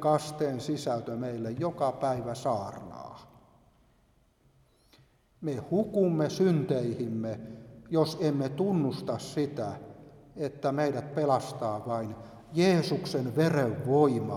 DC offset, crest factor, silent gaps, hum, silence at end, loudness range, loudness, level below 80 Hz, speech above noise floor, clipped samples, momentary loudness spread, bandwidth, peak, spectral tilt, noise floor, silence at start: under 0.1%; 20 dB; none; none; 0 s; 8 LU; -30 LUFS; -64 dBFS; 37 dB; under 0.1%; 14 LU; 15 kHz; -10 dBFS; -7 dB/octave; -66 dBFS; 0 s